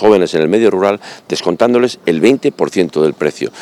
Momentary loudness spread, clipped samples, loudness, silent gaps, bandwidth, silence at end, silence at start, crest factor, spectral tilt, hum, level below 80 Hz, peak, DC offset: 7 LU; under 0.1%; -13 LUFS; none; 12.5 kHz; 0 s; 0 s; 12 dB; -5.5 dB/octave; none; -54 dBFS; 0 dBFS; under 0.1%